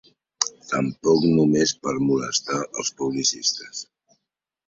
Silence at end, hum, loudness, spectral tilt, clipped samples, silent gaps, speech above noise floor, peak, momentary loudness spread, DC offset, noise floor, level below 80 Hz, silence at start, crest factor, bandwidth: 0.85 s; none; -22 LUFS; -4 dB/octave; under 0.1%; none; 60 dB; 0 dBFS; 9 LU; under 0.1%; -82 dBFS; -60 dBFS; 0.4 s; 22 dB; 7.8 kHz